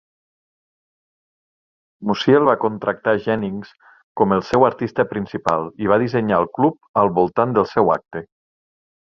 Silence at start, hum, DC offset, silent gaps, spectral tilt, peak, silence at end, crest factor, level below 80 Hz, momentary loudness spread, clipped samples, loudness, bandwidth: 2 s; none; under 0.1%; 4.04-4.15 s, 6.89-6.94 s; -7.5 dB/octave; -2 dBFS; 0.85 s; 18 dB; -54 dBFS; 8 LU; under 0.1%; -19 LUFS; 7.4 kHz